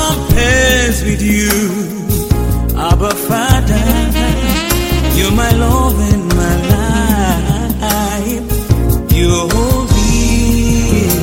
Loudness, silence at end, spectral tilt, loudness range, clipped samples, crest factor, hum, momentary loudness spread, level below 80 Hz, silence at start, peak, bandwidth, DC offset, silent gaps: -13 LUFS; 0 s; -5 dB/octave; 1 LU; under 0.1%; 12 dB; none; 4 LU; -16 dBFS; 0 s; 0 dBFS; 16.5 kHz; under 0.1%; none